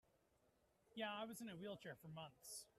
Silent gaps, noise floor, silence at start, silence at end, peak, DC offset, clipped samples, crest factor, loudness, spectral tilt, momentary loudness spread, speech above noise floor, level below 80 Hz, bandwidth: none; -81 dBFS; 0.95 s; 0.1 s; -34 dBFS; under 0.1%; under 0.1%; 20 dB; -53 LUFS; -3.5 dB/octave; 8 LU; 27 dB; -86 dBFS; 15 kHz